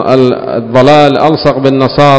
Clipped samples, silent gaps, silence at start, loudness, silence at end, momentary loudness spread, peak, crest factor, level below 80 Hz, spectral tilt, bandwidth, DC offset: 8%; none; 0 s; -8 LUFS; 0 s; 6 LU; 0 dBFS; 6 dB; -38 dBFS; -7 dB/octave; 8 kHz; under 0.1%